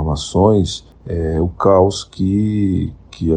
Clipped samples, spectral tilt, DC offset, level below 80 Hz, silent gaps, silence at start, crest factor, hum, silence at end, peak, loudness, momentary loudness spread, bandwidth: under 0.1%; -7 dB/octave; under 0.1%; -32 dBFS; none; 0 s; 14 dB; none; 0 s; 0 dBFS; -16 LUFS; 11 LU; 9.8 kHz